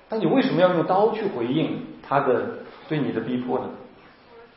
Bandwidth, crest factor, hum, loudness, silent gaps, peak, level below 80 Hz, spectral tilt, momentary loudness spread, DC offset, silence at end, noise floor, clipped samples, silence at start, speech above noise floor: 5.8 kHz; 18 dB; none; -23 LUFS; none; -6 dBFS; -64 dBFS; -11 dB/octave; 14 LU; under 0.1%; 0.1 s; -49 dBFS; under 0.1%; 0.1 s; 27 dB